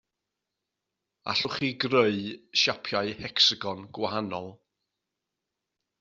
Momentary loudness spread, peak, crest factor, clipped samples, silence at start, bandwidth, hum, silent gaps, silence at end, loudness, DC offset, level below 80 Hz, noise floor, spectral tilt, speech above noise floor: 14 LU; -8 dBFS; 22 dB; under 0.1%; 1.25 s; 7.6 kHz; none; none; 1.45 s; -26 LUFS; under 0.1%; -68 dBFS; -86 dBFS; -1.5 dB/octave; 58 dB